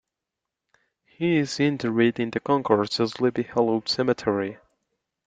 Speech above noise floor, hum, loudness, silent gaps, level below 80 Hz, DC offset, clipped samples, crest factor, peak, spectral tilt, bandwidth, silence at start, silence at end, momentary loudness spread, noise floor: 62 dB; none; -24 LUFS; none; -64 dBFS; under 0.1%; under 0.1%; 22 dB; -4 dBFS; -6 dB/octave; 9.2 kHz; 1.2 s; 0.7 s; 5 LU; -86 dBFS